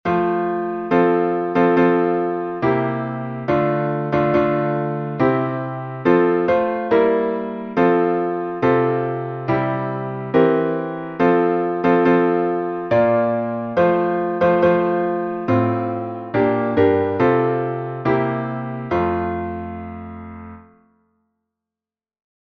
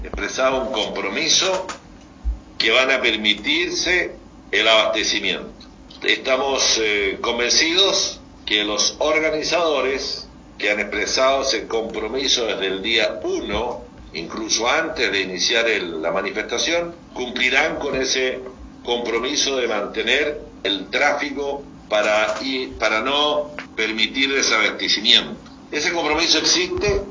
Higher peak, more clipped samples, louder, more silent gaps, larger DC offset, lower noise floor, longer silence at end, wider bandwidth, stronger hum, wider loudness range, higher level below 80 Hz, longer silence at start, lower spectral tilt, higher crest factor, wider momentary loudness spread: about the same, -2 dBFS vs 0 dBFS; neither; about the same, -19 LUFS vs -19 LUFS; neither; neither; first, under -90 dBFS vs -40 dBFS; first, 1.85 s vs 0 s; second, 6.2 kHz vs 7.6 kHz; neither; about the same, 5 LU vs 3 LU; second, -52 dBFS vs -42 dBFS; about the same, 0.05 s vs 0 s; first, -9.5 dB/octave vs -1.5 dB/octave; about the same, 18 dB vs 20 dB; second, 9 LU vs 13 LU